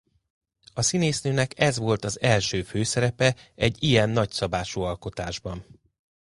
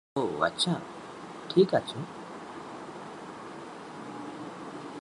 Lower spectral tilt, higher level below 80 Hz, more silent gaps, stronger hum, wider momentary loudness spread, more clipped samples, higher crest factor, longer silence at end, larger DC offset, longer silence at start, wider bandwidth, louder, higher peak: about the same, -4.5 dB/octave vs -5 dB/octave; first, -48 dBFS vs -70 dBFS; neither; neither; second, 11 LU vs 17 LU; neither; about the same, 20 dB vs 24 dB; first, 0.7 s vs 0.05 s; neither; first, 0.75 s vs 0.15 s; about the same, 11.5 kHz vs 11.5 kHz; first, -25 LUFS vs -32 LUFS; first, -6 dBFS vs -10 dBFS